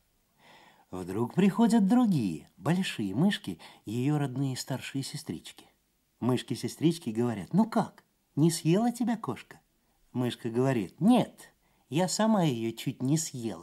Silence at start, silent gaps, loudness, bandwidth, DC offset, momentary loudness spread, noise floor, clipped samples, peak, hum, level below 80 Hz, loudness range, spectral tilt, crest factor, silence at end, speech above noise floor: 0.9 s; none; -29 LUFS; 15 kHz; under 0.1%; 14 LU; -72 dBFS; under 0.1%; -12 dBFS; none; -72 dBFS; 5 LU; -6 dB/octave; 18 dB; 0 s; 43 dB